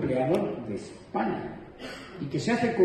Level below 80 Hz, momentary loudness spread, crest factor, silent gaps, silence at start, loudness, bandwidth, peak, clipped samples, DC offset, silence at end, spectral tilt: -58 dBFS; 14 LU; 18 dB; none; 0 s; -30 LUFS; 12 kHz; -10 dBFS; under 0.1%; under 0.1%; 0 s; -6.5 dB/octave